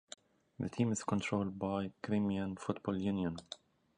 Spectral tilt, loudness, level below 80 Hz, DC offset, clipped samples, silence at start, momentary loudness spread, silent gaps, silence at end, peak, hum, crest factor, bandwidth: -6 dB/octave; -37 LUFS; -62 dBFS; under 0.1%; under 0.1%; 0.6 s; 14 LU; none; 0.4 s; -18 dBFS; none; 20 dB; 10.5 kHz